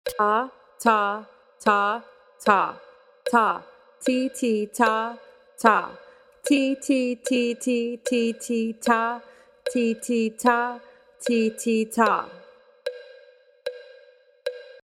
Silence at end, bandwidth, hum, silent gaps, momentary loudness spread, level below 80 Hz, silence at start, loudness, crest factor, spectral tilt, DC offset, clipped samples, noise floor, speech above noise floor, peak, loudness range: 0.2 s; 16 kHz; none; none; 15 LU; -70 dBFS; 0.05 s; -24 LUFS; 24 dB; -4 dB/octave; under 0.1%; under 0.1%; -54 dBFS; 32 dB; 0 dBFS; 3 LU